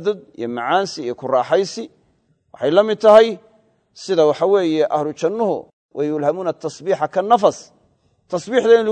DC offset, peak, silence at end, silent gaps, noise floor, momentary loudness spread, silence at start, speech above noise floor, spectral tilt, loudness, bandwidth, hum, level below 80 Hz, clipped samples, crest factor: under 0.1%; 0 dBFS; 0 s; 5.73-5.89 s; -62 dBFS; 14 LU; 0 s; 45 dB; -5 dB/octave; -18 LUFS; 9.2 kHz; none; -66 dBFS; under 0.1%; 18 dB